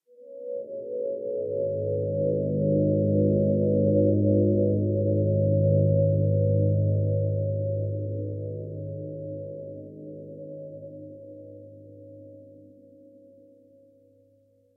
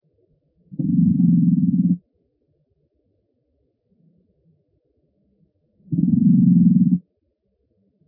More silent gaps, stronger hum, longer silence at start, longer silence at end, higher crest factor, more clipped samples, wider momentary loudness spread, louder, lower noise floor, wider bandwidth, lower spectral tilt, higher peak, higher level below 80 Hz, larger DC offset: neither; neither; second, 0.2 s vs 0.7 s; first, 2.15 s vs 1.1 s; about the same, 16 dB vs 16 dB; neither; first, 21 LU vs 12 LU; second, -25 LUFS vs -18 LUFS; second, -62 dBFS vs -70 dBFS; second, 0.7 kHz vs 0.8 kHz; about the same, -17 dB/octave vs -17 dB/octave; second, -10 dBFS vs -4 dBFS; about the same, -56 dBFS vs -58 dBFS; neither